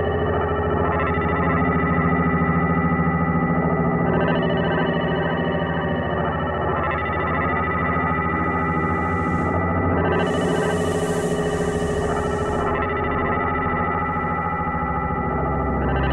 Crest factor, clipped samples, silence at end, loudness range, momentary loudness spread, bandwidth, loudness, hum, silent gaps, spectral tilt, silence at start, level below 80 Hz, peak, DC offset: 12 dB; under 0.1%; 0 s; 2 LU; 3 LU; 12 kHz; -21 LUFS; none; none; -7 dB/octave; 0 s; -34 dBFS; -8 dBFS; under 0.1%